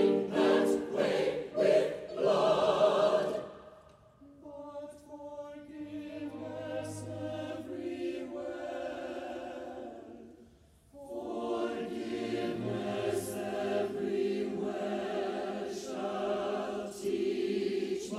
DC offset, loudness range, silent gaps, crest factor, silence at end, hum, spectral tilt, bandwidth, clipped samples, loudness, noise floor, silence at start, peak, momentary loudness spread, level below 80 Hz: under 0.1%; 13 LU; none; 18 dB; 0 s; none; -5.5 dB/octave; 14.5 kHz; under 0.1%; -33 LUFS; -61 dBFS; 0 s; -14 dBFS; 18 LU; -68 dBFS